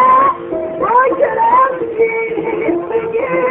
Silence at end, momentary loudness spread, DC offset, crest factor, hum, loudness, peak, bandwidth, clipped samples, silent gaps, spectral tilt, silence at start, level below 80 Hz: 0 s; 7 LU; under 0.1%; 12 dB; none; -14 LUFS; 0 dBFS; 3.8 kHz; under 0.1%; none; -9 dB/octave; 0 s; -50 dBFS